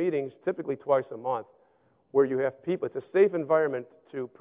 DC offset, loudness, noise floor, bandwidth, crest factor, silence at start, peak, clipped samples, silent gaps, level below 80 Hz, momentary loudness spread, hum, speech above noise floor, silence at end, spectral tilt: under 0.1%; -28 LUFS; -65 dBFS; 3.9 kHz; 18 dB; 0 s; -10 dBFS; under 0.1%; none; -76 dBFS; 12 LU; none; 37 dB; 0.15 s; -10.5 dB/octave